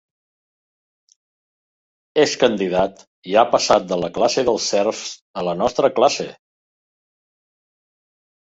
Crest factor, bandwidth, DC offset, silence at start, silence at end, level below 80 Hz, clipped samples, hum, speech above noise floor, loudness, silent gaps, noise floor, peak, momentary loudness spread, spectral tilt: 20 dB; 8 kHz; under 0.1%; 2.15 s; 2.15 s; -56 dBFS; under 0.1%; none; over 72 dB; -19 LUFS; 3.07-3.22 s, 5.21-5.34 s; under -90 dBFS; -2 dBFS; 10 LU; -3.5 dB/octave